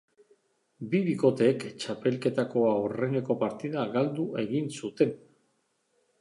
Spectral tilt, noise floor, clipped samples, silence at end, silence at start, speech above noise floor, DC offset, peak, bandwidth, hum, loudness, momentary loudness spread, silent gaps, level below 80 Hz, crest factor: -7 dB/octave; -74 dBFS; under 0.1%; 1.05 s; 0.8 s; 46 dB; under 0.1%; -10 dBFS; 11.5 kHz; none; -28 LUFS; 8 LU; none; -74 dBFS; 20 dB